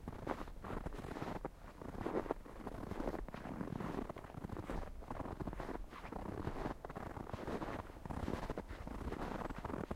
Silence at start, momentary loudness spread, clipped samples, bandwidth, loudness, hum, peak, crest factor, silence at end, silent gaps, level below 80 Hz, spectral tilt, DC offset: 0 s; 6 LU; under 0.1%; 16 kHz; -46 LUFS; none; -20 dBFS; 24 dB; 0 s; none; -52 dBFS; -7 dB/octave; under 0.1%